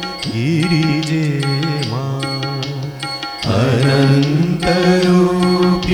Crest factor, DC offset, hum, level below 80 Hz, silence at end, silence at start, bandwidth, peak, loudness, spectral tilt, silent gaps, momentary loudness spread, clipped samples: 14 dB; under 0.1%; none; -40 dBFS; 0 s; 0 s; 13.5 kHz; 0 dBFS; -16 LUFS; -6.5 dB/octave; none; 10 LU; under 0.1%